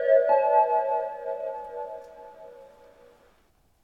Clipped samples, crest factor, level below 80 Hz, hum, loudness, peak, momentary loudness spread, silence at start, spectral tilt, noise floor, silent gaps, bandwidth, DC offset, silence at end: under 0.1%; 18 dB; -70 dBFS; none; -25 LUFS; -8 dBFS; 26 LU; 0 s; -4.5 dB/octave; -65 dBFS; none; 4.8 kHz; under 0.1%; 1.2 s